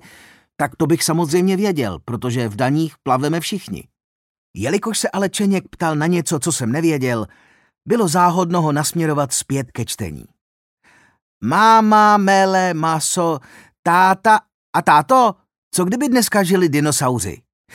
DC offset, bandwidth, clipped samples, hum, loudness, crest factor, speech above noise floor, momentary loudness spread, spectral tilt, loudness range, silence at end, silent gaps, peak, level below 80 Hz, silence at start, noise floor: under 0.1%; 17 kHz; under 0.1%; none; -17 LUFS; 16 dB; 31 dB; 12 LU; -4.5 dB/octave; 6 LU; 0.4 s; 4.04-4.54 s, 10.41-10.77 s, 11.22-11.41 s, 13.79-13.83 s, 14.54-14.73 s, 15.58-15.71 s; 0 dBFS; -54 dBFS; 0.6 s; -47 dBFS